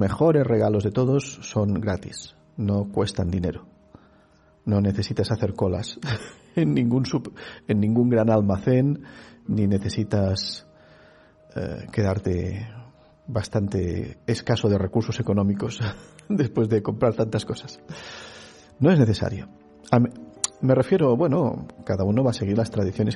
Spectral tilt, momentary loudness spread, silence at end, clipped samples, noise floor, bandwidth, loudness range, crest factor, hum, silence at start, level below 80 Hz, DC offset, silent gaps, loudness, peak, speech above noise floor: -7 dB/octave; 17 LU; 0 s; under 0.1%; -57 dBFS; 11.5 kHz; 5 LU; 22 dB; none; 0 s; -50 dBFS; under 0.1%; none; -24 LUFS; -2 dBFS; 34 dB